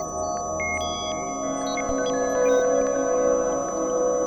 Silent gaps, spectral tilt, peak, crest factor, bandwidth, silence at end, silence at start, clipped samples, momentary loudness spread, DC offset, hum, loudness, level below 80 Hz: none; -3 dB/octave; -10 dBFS; 14 dB; 19 kHz; 0 s; 0 s; under 0.1%; 7 LU; under 0.1%; none; -24 LUFS; -48 dBFS